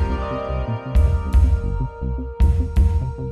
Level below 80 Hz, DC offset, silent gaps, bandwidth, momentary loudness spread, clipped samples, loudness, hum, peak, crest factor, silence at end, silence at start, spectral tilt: -20 dBFS; under 0.1%; none; 4.9 kHz; 8 LU; under 0.1%; -21 LUFS; none; -6 dBFS; 12 dB; 0 s; 0 s; -8.5 dB/octave